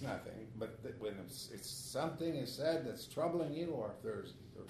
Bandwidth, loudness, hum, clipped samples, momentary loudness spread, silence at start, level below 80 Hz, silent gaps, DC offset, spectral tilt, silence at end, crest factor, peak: 13.5 kHz; -42 LUFS; none; under 0.1%; 9 LU; 0 s; -70 dBFS; none; under 0.1%; -5 dB/octave; 0 s; 18 dB; -24 dBFS